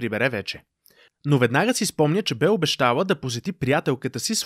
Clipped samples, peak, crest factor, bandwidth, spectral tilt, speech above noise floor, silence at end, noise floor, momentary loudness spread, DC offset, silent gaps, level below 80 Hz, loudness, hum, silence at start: under 0.1%; -4 dBFS; 18 dB; 15.5 kHz; -4.5 dB/octave; 35 dB; 0 s; -58 dBFS; 9 LU; under 0.1%; none; -60 dBFS; -22 LUFS; none; 0 s